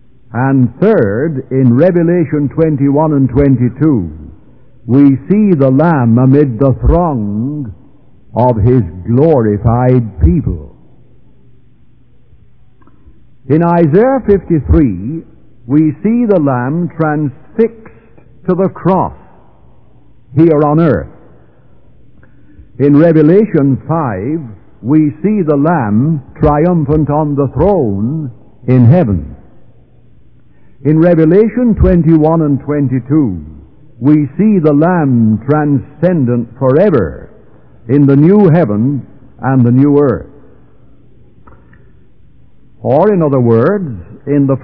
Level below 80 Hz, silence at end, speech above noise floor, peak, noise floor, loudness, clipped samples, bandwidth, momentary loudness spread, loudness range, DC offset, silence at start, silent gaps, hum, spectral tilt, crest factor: -28 dBFS; 0 s; 37 dB; 0 dBFS; -47 dBFS; -11 LUFS; 0.9%; 4.7 kHz; 11 LU; 5 LU; 1%; 0.3 s; none; none; -13 dB/octave; 12 dB